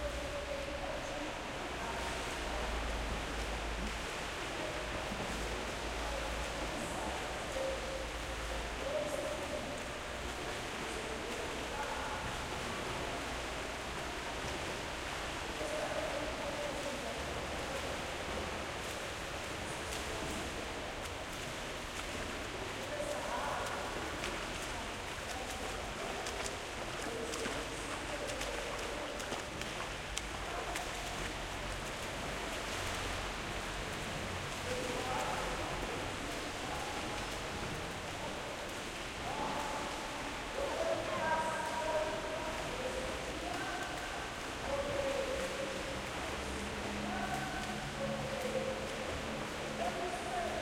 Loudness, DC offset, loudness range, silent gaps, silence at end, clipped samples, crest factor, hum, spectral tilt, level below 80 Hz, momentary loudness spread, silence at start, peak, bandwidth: -39 LUFS; under 0.1%; 2 LU; none; 0 s; under 0.1%; 26 dB; none; -3.5 dB/octave; -50 dBFS; 4 LU; 0 s; -12 dBFS; 16.5 kHz